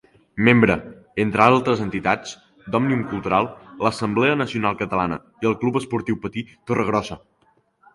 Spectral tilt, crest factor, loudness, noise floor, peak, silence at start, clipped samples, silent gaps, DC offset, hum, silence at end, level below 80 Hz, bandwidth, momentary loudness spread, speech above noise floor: -6.5 dB/octave; 22 dB; -21 LUFS; -62 dBFS; 0 dBFS; 0.35 s; under 0.1%; none; under 0.1%; none; 0.75 s; -50 dBFS; 11.5 kHz; 14 LU; 42 dB